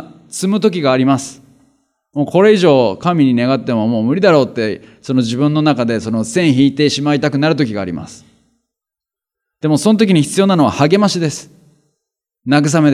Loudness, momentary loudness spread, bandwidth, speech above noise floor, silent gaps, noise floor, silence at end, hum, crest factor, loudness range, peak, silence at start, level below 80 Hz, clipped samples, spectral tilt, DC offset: -14 LUFS; 11 LU; 14 kHz; 74 dB; none; -87 dBFS; 0 s; none; 14 dB; 4 LU; 0 dBFS; 0 s; -58 dBFS; under 0.1%; -6 dB/octave; under 0.1%